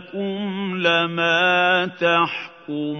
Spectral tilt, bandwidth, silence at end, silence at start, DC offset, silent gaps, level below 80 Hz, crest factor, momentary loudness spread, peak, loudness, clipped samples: -5 dB/octave; 6.6 kHz; 0 s; 0 s; under 0.1%; none; -76 dBFS; 18 dB; 12 LU; -4 dBFS; -19 LUFS; under 0.1%